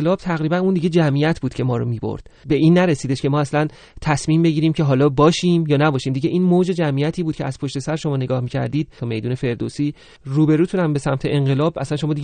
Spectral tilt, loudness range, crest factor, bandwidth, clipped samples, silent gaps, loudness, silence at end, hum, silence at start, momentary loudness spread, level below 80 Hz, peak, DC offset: -7 dB/octave; 5 LU; 18 dB; 9.4 kHz; under 0.1%; none; -19 LUFS; 0 s; none; 0 s; 9 LU; -46 dBFS; 0 dBFS; under 0.1%